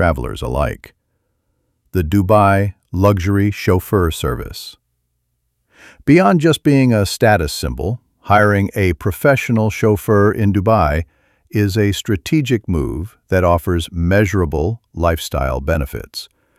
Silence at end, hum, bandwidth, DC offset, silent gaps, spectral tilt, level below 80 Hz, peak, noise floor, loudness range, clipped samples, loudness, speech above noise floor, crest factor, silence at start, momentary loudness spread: 0.35 s; none; 15.5 kHz; under 0.1%; none; -6.5 dB/octave; -30 dBFS; 0 dBFS; -69 dBFS; 3 LU; under 0.1%; -16 LUFS; 53 dB; 16 dB; 0 s; 11 LU